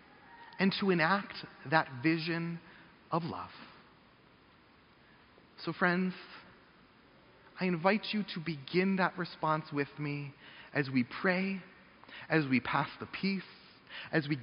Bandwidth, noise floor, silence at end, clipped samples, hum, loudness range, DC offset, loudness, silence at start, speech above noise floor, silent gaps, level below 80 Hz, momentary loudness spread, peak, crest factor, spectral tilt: 5.4 kHz; -62 dBFS; 0 s; under 0.1%; none; 6 LU; under 0.1%; -33 LUFS; 0.3 s; 29 dB; none; -72 dBFS; 18 LU; -10 dBFS; 24 dB; -4.5 dB/octave